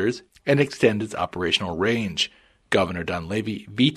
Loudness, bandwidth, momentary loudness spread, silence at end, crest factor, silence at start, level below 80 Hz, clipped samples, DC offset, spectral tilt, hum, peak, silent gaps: -24 LUFS; 13.5 kHz; 7 LU; 0 s; 20 dB; 0 s; -52 dBFS; under 0.1%; under 0.1%; -5 dB/octave; none; -2 dBFS; none